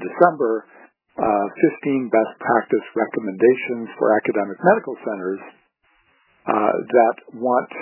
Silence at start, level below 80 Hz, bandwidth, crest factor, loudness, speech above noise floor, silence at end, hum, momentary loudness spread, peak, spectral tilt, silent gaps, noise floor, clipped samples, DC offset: 0 s; -66 dBFS; 3.1 kHz; 20 dB; -20 LUFS; 43 dB; 0 s; none; 10 LU; 0 dBFS; -10.5 dB/octave; none; -62 dBFS; under 0.1%; under 0.1%